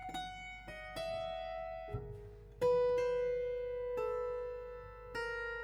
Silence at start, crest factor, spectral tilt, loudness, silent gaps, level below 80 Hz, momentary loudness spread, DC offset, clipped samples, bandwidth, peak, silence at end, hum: 0 s; 16 dB; -5 dB/octave; -39 LUFS; none; -56 dBFS; 15 LU; under 0.1%; under 0.1%; 12.5 kHz; -24 dBFS; 0 s; none